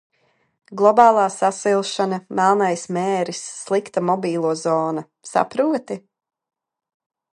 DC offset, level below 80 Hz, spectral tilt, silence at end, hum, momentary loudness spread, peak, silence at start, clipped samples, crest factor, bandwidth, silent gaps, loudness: under 0.1%; -72 dBFS; -5 dB/octave; 1.35 s; none; 12 LU; 0 dBFS; 0.7 s; under 0.1%; 20 dB; 11.5 kHz; none; -19 LUFS